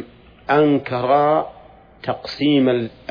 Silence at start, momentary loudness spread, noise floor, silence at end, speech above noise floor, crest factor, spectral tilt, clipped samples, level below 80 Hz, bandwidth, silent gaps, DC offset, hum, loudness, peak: 0 s; 14 LU; -45 dBFS; 0.2 s; 28 dB; 16 dB; -8 dB/octave; under 0.1%; -54 dBFS; 5.2 kHz; none; under 0.1%; none; -18 LUFS; -4 dBFS